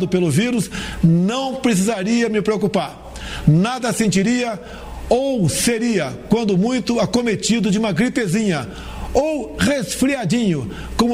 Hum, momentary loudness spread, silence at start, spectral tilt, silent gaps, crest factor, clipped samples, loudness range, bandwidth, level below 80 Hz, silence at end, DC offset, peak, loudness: none; 8 LU; 0 s; -5.5 dB/octave; none; 16 dB; under 0.1%; 1 LU; 16 kHz; -38 dBFS; 0 s; under 0.1%; -2 dBFS; -18 LUFS